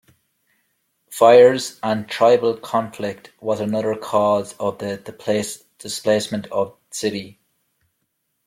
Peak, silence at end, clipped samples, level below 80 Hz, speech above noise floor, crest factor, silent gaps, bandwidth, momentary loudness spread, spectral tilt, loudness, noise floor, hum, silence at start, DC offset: -2 dBFS; 1.15 s; under 0.1%; -64 dBFS; 54 dB; 18 dB; none; 15.5 kHz; 16 LU; -4.5 dB/octave; -19 LUFS; -73 dBFS; none; 1.1 s; under 0.1%